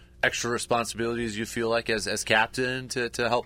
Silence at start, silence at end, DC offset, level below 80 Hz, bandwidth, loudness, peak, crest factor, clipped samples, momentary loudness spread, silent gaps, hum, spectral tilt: 0 s; 0 s; under 0.1%; -52 dBFS; 16 kHz; -27 LUFS; -6 dBFS; 22 dB; under 0.1%; 6 LU; none; none; -3 dB/octave